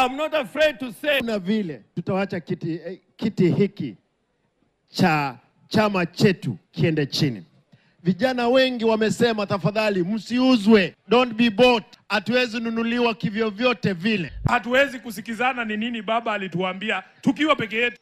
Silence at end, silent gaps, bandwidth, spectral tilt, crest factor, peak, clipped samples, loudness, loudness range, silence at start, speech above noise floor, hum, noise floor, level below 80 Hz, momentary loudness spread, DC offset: 0.05 s; none; 14.5 kHz; -6 dB/octave; 18 dB; -4 dBFS; under 0.1%; -22 LUFS; 5 LU; 0 s; 48 dB; none; -70 dBFS; -52 dBFS; 10 LU; under 0.1%